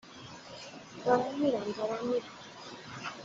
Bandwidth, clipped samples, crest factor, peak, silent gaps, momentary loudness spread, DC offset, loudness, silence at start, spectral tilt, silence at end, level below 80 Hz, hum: 7.8 kHz; under 0.1%; 24 dB; -12 dBFS; none; 17 LU; under 0.1%; -32 LUFS; 0.05 s; -5 dB/octave; 0 s; -72 dBFS; none